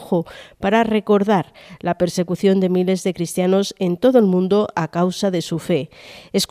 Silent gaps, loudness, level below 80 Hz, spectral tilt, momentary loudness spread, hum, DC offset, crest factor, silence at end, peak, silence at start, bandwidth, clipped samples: none; -19 LUFS; -54 dBFS; -6 dB/octave; 9 LU; none; under 0.1%; 16 dB; 0.05 s; -2 dBFS; 0 s; 15.5 kHz; under 0.1%